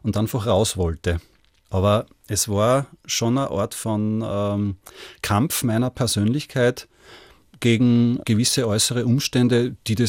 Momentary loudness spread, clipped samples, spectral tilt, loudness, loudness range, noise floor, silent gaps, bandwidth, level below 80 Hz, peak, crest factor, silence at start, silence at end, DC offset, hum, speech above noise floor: 7 LU; under 0.1%; -5 dB/octave; -21 LUFS; 3 LU; -48 dBFS; none; 17 kHz; -48 dBFS; -4 dBFS; 18 dB; 0.05 s; 0 s; under 0.1%; none; 27 dB